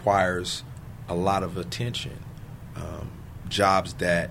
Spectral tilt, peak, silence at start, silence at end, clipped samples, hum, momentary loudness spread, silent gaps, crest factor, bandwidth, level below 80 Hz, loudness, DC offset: -4.5 dB/octave; -6 dBFS; 0 s; 0 s; under 0.1%; none; 19 LU; none; 22 dB; 16 kHz; -46 dBFS; -26 LUFS; under 0.1%